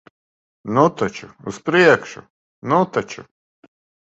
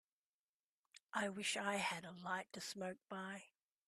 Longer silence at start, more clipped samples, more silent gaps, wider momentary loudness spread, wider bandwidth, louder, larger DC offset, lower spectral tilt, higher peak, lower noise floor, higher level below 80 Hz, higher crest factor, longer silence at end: second, 0.65 s vs 0.95 s; neither; first, 2.30-2.62 s vs 1.03-1.07 s; first, 22 LU vs 9 LU; second, 8.2 kHz vs 14.5 kHz; first, -18 LUFS vs -44 LUFS; neither; first, -6 dB/octave vs -3 dB/octave; first, 0 dBFS vs -24 dBFS; about the same, under -90 dBFS vs under -90 dBFS; first, -58 dBFS vs -88 dBFS; about the same, 20 dB vs 22 dB; first, 0.85 s vs 0.4 s